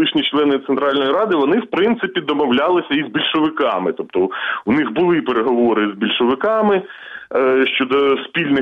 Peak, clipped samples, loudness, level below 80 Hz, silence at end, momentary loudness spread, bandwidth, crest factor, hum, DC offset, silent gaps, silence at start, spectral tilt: -6 dBFS; under 0.1%; -17 LUFS; -58 dBFS; 0 s; 4 LU; 5.2 kHz; 12 dB; none; under 0.1%; none; 0 s; -7.5 dB/octave